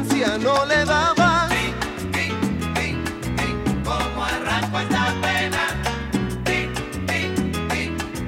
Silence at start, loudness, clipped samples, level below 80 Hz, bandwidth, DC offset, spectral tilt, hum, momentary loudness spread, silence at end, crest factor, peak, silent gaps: 0 s; -22 LUFS; under 0.1%; -36 dBFS; 17 kHz; under 0.1%; -4.5 dB/octave; none; 8 LU; 0 s; 16 dB; -6 dBFS; none